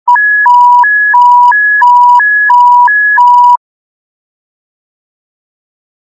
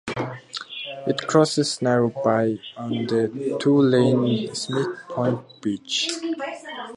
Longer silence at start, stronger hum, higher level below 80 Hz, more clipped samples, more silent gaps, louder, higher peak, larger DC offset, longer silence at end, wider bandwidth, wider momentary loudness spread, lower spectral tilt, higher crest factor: about the same, 0.05 s vs 0.05 s; neither; second, -80 dBFS vs -64 dBFS; first, 3% vs under 0.1%; neither; first, -4 LUFS vs -23 LUFS; about the same, 0 dBFS vs -2 dBFS; neither; first, 2.5 s vs 0 s; second, 7.2 kHz vs 11.5 kHz; second, 2 LU vs 12 LU; second, 3 dB/octave vs -5 dB/octave; second, 6 dB vs 20 dB